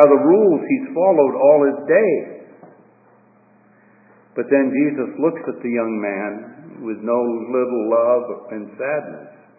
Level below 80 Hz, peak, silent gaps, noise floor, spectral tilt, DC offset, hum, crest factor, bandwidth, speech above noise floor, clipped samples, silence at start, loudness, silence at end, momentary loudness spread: -76 dBFS; 0 dBFS; none; -53 dBFS; -12 dB/octave; under 0.1%; none; 18 dB; 2.7 kHz; 36 dB; under 0.1%; 0 s; -18 LUFS; 0.3 s; 17 LU